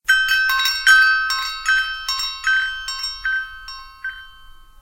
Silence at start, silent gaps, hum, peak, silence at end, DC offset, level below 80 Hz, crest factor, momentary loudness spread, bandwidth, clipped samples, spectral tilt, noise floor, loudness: 0.1 s; none; none; 0 dBFS; 0.35 s; under 0.1%; -46 dBFS; 20 dB; 19 LU; 16.5 kHz; under 0.1%; 3.5 dB/octave; -43 dBFS; -17 LUFS